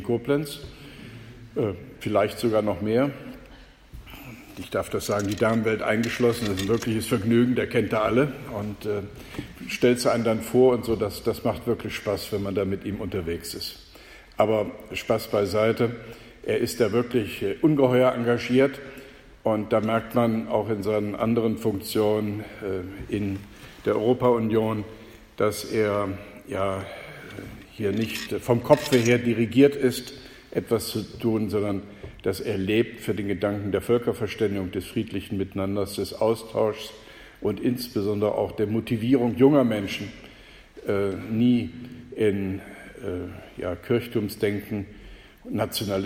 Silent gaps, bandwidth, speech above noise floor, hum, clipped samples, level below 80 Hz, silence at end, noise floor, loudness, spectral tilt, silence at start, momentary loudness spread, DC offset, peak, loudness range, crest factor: none; 16.5 kHz; 24 dB; none; under 0.1%; -52 dBFS; 0 s; -48 dBFS; -25 LUFS; -6 dB/octave; 0 s; 17 LU; under 0.1%; -2 dBFS; 5 LU; 24 dB